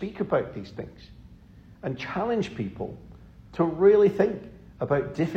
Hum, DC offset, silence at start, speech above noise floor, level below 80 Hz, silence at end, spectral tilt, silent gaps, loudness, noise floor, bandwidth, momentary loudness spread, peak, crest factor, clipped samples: none; under 0.1%; 0 s; 25 dB; -52 dBFS; 0 s; -8 dB/octave; none; -25 LUFS; -50 dBFS; 7.6 kHz; 21 LU; -8 dBFS; 18 dB; under 0.1%